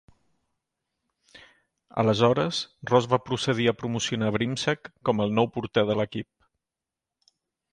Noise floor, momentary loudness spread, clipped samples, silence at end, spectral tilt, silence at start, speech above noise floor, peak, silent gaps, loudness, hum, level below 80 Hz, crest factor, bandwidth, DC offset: -89 dBFS; 8 LU; under 0.1%; 1.5 s; -5.5 dB/octave; 1.35 s; 64 dB; -6 dBFS; none; -25 LUFS; none; -60 dBFS; 22 dB; 10.5 kHz; under 0.1%